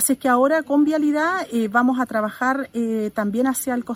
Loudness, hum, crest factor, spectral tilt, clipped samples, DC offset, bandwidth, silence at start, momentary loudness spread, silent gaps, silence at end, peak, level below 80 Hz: -20 LUFS; none; 16 dB; -4 dB/octave; under 0.1%; under 0.1%; 16 kHz; 0 s; 6 LU; none; 0 s; -4 dBFS; -62 dBFS